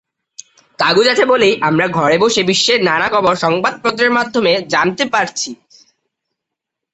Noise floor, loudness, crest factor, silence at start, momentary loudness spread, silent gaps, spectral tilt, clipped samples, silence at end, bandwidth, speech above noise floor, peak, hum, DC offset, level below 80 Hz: -80 dBFS; -13 LUFS; 14 dB; 0.8 s; 5 LU; none; -3.5 dB/octave; under 0.1%; 1.4 s; 8.2 kHz; 67 dB; 0 dBFS; none; under 0.1%; -56 dBFS